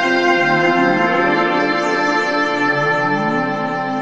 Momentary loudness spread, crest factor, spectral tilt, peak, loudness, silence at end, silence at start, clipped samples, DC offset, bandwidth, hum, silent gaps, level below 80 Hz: 5 LU; 14 dB; -5 dB/octave; -2 dBFS; -16 LUFS; 0 s; 0 s; under 0.1%; under 0.1%; 8.8 kHz; none; none; -58 dBFS